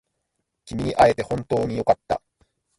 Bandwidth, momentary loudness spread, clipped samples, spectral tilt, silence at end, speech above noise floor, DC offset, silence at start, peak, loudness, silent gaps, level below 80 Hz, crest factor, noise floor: 11.5 kHz; 11 LU; under 0.1%; -6.5 dB/octave; 0.6 s; 56 dB; under 0.1%; 0.65 s; -2 dBFS; -22 LUFS; none; -48 dBFS; 20 dB; -77 dBFS